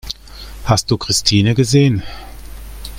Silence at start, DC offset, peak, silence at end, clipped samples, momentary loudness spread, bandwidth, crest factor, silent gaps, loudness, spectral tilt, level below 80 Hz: 0.05 s; under 0.1%; 0 dBFS; 0 s; under 0.1%; 22 LU; 16.5 kHz; 16 dB; none; -14 LUFS; -5 dB/octave; -34 dBFS